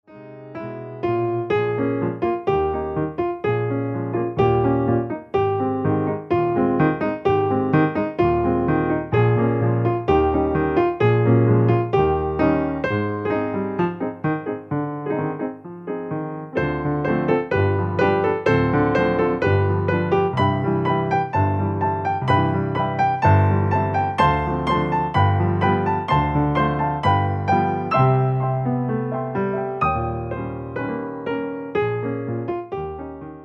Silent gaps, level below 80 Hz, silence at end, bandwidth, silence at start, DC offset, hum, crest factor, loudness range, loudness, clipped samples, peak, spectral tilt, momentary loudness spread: none; -42 dBFS; 0 s; 6.8 kHz; 0.1 s; under 0.1%; none; 16 dB; 6 LU; -21 LUFS; under 0.1%; -4 dBFS; -9 dB/octave; 9 LU